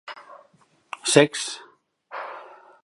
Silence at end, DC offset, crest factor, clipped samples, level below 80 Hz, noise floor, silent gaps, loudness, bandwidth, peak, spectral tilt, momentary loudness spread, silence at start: 0.35 s; under 0.1%; 26 dB; under 0.1%; -76 dBFS; -61 dBFS; none; -21 LUFS; 11.5 kHz; 0 dBFS; -3.5 dB/octave; 23 LU; 0.05 s